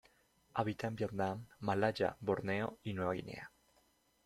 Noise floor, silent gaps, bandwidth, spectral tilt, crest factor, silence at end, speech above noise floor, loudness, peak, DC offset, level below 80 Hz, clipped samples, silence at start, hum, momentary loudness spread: -74 dBFS; none; 14.5 kHz; -7 dB/octave; 20 dB; 0.8 s; 36 dB; -38 LUFS; -18 dBFS; under 0.1%; -70 dBFS; under 0.1%; 0.55 s; none; 8 LU